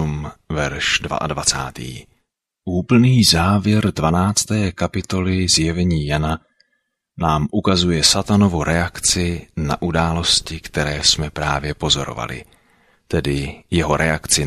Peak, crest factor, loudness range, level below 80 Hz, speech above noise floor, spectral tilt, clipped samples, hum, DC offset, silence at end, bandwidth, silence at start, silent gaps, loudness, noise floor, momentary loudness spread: 0 dBFS; 18 dB; 3 LU; -36 dBFS; 53 dB; -4 dB/octave; under 0.1%; none; under 0.1%; 0 s; 14.5 kHz; 0 s; none; -18 LUFS; -71 dBFS; 11 LU